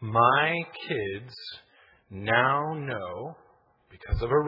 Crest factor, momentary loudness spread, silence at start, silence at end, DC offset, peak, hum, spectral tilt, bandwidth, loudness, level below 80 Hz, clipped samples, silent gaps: 22 dB; 21 LU; 0 s; 0 s; under 0.1%; -6 dBFS; none; -8 dB/octave; 5.8 kHz; -27 LUFS; -42 dBFS; under 0.1%; none